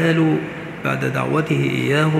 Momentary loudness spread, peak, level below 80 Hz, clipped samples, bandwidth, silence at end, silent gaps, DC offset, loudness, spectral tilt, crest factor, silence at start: 7 LU; -4 dBFS; -56 dBFS; under 0.1%; 14 kHz; 0 s; none; under 0.1%; -20 LUFS; -7 dB/octave; 16 dB; 0 s